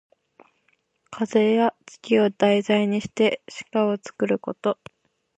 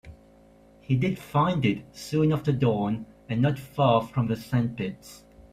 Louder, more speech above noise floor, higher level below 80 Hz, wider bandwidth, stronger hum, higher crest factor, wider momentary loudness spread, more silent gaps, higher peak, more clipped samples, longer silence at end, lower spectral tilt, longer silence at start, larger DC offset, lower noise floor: first, -23 LUFS vs -26 LUFS; first, 46 dB vs 30 dB; second, -68 dBFS vs -54 dBFS; second, 8.8 kHz vs 15 kHz; neither; about the same, 18 dB vs 18 dB; about the same, 12 LU vs 11 LU; neither; first, -6 dBFS vs -10 dBFS; neither; first, 0.65 s vs 0.1 s; second, -6 dB/octave vs -7.5 dB/octave; first, 1.1 s vs 0.05 s; neither; first, -68 dBFS vs -55 dBFS